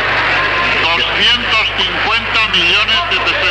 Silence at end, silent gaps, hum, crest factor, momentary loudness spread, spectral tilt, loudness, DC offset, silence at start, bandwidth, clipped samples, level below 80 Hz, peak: 0 s; none; none; 10 dB; 3 LU; -2.5 dB/octave; -11 LUFS; under 0.1%; 0 s; 11 kHz; under 0.1%; -34 dBFS; -2 dBFS